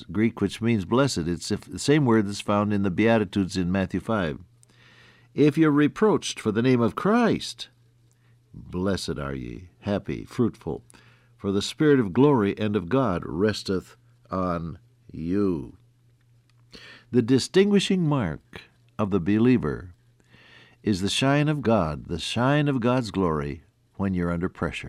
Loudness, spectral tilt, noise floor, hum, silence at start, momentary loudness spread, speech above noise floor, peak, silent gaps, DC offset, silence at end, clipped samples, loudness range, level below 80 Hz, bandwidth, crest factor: -24 LUFS; -6 dB/octave; -60 dBFS; none; 0 s; 14 LU; 36 dB; -8 dBFS; none; under 0.1%; 0 s; under 0.1%; 7 LU; -50 dBFS; 13.5 kHz; 16 dB